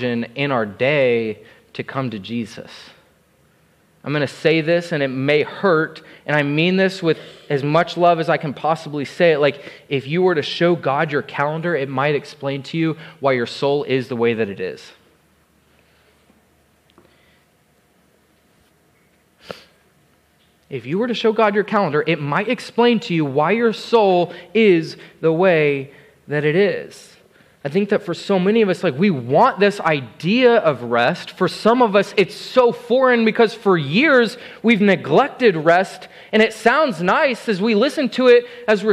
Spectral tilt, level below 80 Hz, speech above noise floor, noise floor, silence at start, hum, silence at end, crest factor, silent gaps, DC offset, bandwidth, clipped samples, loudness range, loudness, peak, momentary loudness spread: -6.5 dB/octave; -66 dBFS; 41 dB; -58 dBFS; 0 s; none; 0 s; 16 dB; none; under 0.1%; 12.5 kHz; under 0.1%; 7 LU; -18 LUFS; -2 dBFS; 12 LU